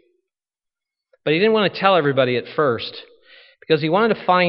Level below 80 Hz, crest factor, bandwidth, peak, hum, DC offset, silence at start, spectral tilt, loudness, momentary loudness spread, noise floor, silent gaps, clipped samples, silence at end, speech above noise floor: -66 dBFS; 20 dB; 5.8 kHz; 0 dBFS; none; under 0.1%; 1.25 s; -3.5 dB/octave; -18 LUFS; 11 LU; -87 dBFS; none; under 0.1%; 0 s; 69 dB